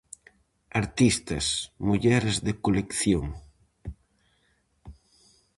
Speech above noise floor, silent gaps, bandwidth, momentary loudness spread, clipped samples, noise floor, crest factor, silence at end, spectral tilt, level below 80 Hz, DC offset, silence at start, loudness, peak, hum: 44 dB; none; 11.5 kHz; 21 LU; under 0.1%; -69 dBFS; 20 dB; 0.65 s; -4.5 dB/octave; -46 dBFS; under 0.1%; 0.75 s; -26 LUFS; -8 dBFS; none